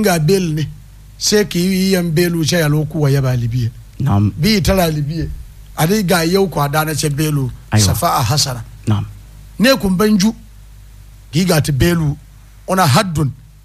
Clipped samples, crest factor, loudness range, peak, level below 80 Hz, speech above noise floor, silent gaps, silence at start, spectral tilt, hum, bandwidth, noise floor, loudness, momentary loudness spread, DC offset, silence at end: under 0.1%; 14 dB; 2 LU; 0 dBFS; -34 dBFS; 24 dB; none; 0 s; -5 dB/octave; none; 15.5 kHz; -38 dBFS; -15 LUFS; 9 LU; under 0.1%; 0.25 s